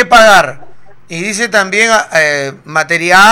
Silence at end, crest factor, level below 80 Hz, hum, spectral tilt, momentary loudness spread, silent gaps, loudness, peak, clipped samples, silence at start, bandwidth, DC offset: 0 s; 10 dB; -42 dBFS; none; -2.5 dB/octave; 13 LU; none; -9 LUFS; 0 dBFS; 1%; 0 s; 19 kHz; under 0.1%